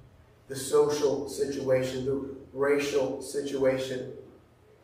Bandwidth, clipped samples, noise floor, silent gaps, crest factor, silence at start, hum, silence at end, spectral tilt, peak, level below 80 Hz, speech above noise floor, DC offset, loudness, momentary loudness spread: 15.5 kHz; under 0.1%; -57 dBFS; none; 16 dB; 0.5 s; none; 0.55 s; -4.5 dB/octave; -12 dBFS; -60 dBFS; 29 dB; under 0.1%; -29 LUFS; 12 LU